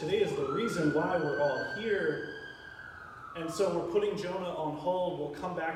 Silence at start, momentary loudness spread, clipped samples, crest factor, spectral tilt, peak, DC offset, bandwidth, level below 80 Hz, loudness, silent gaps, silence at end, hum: 0 s; 15 LU; under 0.1%; 16 dB; -5.5 dB/octave; -16 dBFS; under 0.1%; 14 kHz; -64 dBFS; -32 LUFS; none; 0 s; none